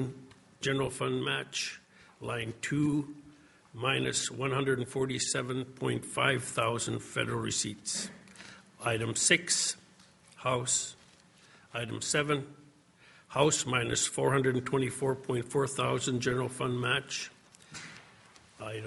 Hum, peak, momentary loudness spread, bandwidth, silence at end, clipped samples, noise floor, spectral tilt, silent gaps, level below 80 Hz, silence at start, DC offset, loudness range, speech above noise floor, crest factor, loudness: none; -10 dBFS; 16 LU; 11.5 kHz; 0 s; under 0.1%; -60 dBFS; -3.5 dB/octave; none; -66 dBFS; 0 s; under 0.1%; 4 LU; 29 dB; 24 dB; -31 LUFS